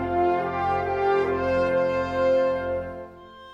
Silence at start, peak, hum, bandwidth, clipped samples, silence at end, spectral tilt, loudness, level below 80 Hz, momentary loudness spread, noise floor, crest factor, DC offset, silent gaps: 0 s; -12 dBFS; none; 7.2 kHz; under 0.1%; 0 s; -7.5 dB/octave; -24 LUFS; -48 dBFS; 9 LU; -44 dBFS; 12 dB; under 0.1%; none